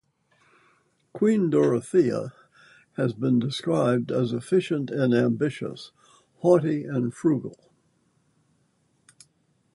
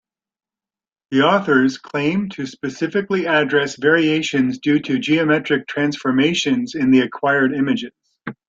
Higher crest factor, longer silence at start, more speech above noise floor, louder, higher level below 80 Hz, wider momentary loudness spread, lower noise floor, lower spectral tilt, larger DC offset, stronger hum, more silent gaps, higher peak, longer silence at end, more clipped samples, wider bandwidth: about the same, 20 dB vs 16 dB; about the same, 1.15 s vs 1.1 s; second, 44 dB vs over 72 dB; second, -24 LUFS vs -18 LUFS; second, -68 dBFS vs -60 dBFS; first, 14 LU vs 8 LU; second, -68 dBFS vs under -90 dBFS; first, -7.5 dB/octave vs -5 dB/octave; neither; neither; neither; second, -6 dBFS vs -2 dBFS; first, 2.2 s vs 0.15 s; neither; first, 11.5 kHz vs 7.8 kHz